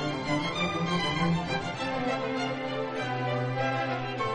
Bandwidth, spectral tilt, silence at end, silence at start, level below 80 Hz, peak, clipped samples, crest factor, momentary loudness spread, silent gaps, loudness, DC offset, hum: 10 kHz; -5.5 dB/octave; 0 s; 0 s; -56 dBFS; -16 dBFS; under 0.1%; 14 dB; 4 LU; none; -30 LUFS; under 0.1%; none